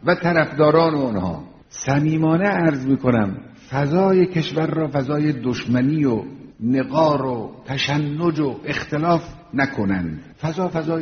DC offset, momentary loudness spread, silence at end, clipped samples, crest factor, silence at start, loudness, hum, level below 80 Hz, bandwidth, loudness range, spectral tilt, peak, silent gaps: under 0.1%; 11 LU; 0 s; under 0.1%; 18 dB; 0.05 s; -20 LUFS; none; -50 dBFS; 6.6 kHz; 3 LU; -6 dB/octave; -2 dBFS; none